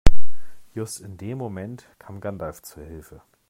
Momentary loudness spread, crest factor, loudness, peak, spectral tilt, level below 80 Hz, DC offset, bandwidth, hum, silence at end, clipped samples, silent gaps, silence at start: 11 LU; 16 dB; -34 LUFS; 0 dBFS; -5.5 dB/octave; -30 dBFS; under 0.1%; 13 kHz; none; 0 s; 0.4%; none; 0.05 s